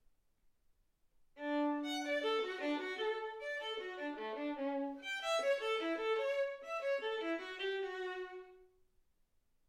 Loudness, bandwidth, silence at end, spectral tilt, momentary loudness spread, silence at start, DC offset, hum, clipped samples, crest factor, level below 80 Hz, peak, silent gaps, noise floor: -39 LUFS; 15.5 kHz; 1.05 s; -1.5 dB/octave; 7 LU; 1.35 s; under 0.1%; none; under 0.1%; 16 dB; -78 dBFS; -24 dBFS; none; -75 dBFS